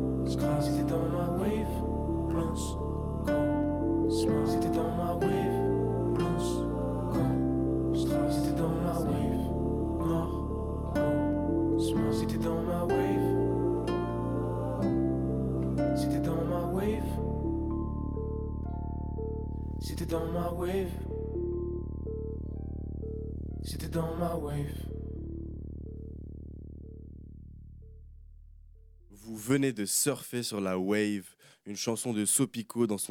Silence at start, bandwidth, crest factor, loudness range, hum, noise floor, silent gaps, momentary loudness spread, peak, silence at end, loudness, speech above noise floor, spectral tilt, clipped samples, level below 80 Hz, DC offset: 0 s; 17.5 kHz; 16 dB; 8 LU; none; -54 dBFS; none; 12 LU; -14 dBFS; 0 s; -31 LUFS; 24 dB; -6 dB/octave; under 0.1%; -40 dBFS; under 0.1%